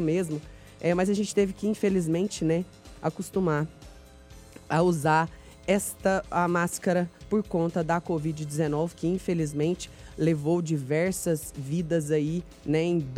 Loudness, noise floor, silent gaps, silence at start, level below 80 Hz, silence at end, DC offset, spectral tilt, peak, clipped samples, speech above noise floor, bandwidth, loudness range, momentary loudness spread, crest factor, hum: -27 LUFS; -49 dBFS; none; 0 s; -52 dBFS; 0 s; under 0.1%; -6 dB/octave; -8 dBFS; under 0.1%; 22 dB; 16 kHz; 2 LU; 7 LU; 18 dB; none